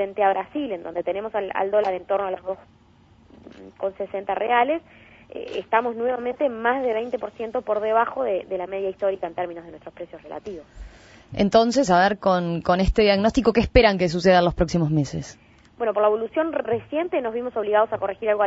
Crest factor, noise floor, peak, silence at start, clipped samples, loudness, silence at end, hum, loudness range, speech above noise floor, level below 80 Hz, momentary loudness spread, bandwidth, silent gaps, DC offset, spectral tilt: 22 dB; -54 dBFS; -2 dBFS; 0 s; under 0.1%; -22 LUFS; 0 s; none; 8 LU; 31 dB; -40 dBFS; 16 LU; 8 kHz; none; under 0.1%; -6 dB/octave